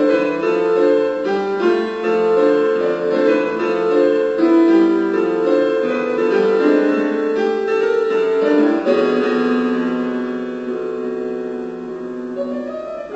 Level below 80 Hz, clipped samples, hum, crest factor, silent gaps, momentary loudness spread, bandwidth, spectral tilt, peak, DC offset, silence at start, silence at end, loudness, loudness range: -58 dBFS; under 0.1%; none; 14 dB; none; 10 LU; 8 kHz; -6.5 dB/octave; -4 dBFS; under 0.1%; 0 s; 0 s; -17 LUFS; 6 LU